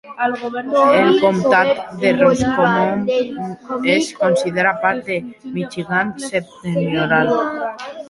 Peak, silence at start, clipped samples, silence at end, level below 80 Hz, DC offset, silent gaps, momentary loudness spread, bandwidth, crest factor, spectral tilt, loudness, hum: -2 dBFS; 0.05 s; under 0.1%; 0 s; -52 dBFS; under 0.1%; none; 11 LU; 11.5 kHz; 16 dB; -5.5 dB/octave; -17 LUFS; none